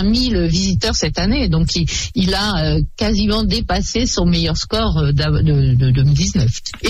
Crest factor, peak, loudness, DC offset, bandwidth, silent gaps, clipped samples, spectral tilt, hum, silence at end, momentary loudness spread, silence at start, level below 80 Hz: 10 dB; -6 dBFS; -16 LUFS; under 0.1%; 11.5 kHz; none; under 0.1%; -5 dB/octave; none; 0 s; 4 LU; 0 s; -24 dBFS